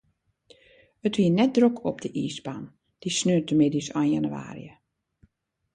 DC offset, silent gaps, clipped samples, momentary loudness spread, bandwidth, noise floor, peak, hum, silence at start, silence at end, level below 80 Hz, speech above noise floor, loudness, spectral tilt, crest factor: under 0.1%; none; under 0.1%; 17 LU; 10.5 kHz; -69 dBFS; -8 dBFS; none; 1.05 s; 1.05 s; -64 dBFS; 45 dB; -25 LUFS; -5.5 dB/octave; 18 dB